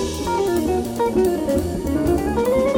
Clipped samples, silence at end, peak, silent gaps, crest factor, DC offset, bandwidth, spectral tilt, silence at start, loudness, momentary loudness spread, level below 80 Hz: under 0.1%; 0 s; -6 dBFS; none; 12 dB; under 0.1%; 18.5 kHz; -6 dB/octave; 0 s; -20 LUFS; 3 LU; -34 dBFS